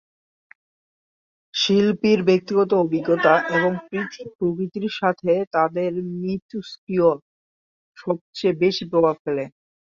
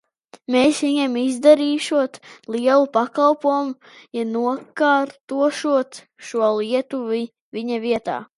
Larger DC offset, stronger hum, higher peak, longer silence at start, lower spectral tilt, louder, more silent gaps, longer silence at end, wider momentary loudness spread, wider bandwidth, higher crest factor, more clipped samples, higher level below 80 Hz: neither; neither; about the same, -4 dBFS vs -2 dBFS; first, 1.55 s vs 0.5 s; first, -6 dB/octave vs -4 dB/octave; about the same, -21 LUFS vs -20 LUFS; first, 4.35-4.39 s, 5.47-5.51 s, 6.42-6.49 s, 6.78-6.87 s, 7.22-7.93 s, 8.21-8.33 s, 9.19-9.25 s vs 5.21-5.28 s, 7.41-7.52 s; first, 0.45 s vs 0.15 s; about the same, 11 LU vs 13 LU; second, 7.4 kHz vs 11.5 kHz; about the same, 18 dB vs 18 dB; neither; first, -62 dBFS vs -68 dBFS